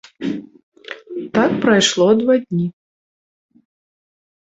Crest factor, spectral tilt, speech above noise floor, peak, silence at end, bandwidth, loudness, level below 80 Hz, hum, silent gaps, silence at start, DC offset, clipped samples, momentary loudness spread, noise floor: 18 dB; -4.5 dB/octave; over 75 dB; -2 dBFS; 1.7 s; 8.4 kHz; -16 LUFS; -58 dBFS; none; 0.63-0.72 s; 0.2 s; under 0.1%; under 0.1%; 17 LU; under -90 dBFS